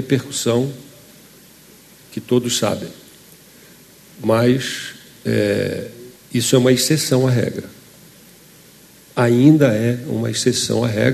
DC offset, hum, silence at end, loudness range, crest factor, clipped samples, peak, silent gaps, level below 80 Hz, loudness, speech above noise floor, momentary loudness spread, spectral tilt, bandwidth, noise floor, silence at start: under 0.1%; none; 0 s; 6 LU; 18 dB; under 0.1%; 0 dBFS; none; -56 dBFS; -18 LUFS; 29 dB; 17 LU; -5 dB/octave; 13.5 kHz; -46 dBFS; 0 s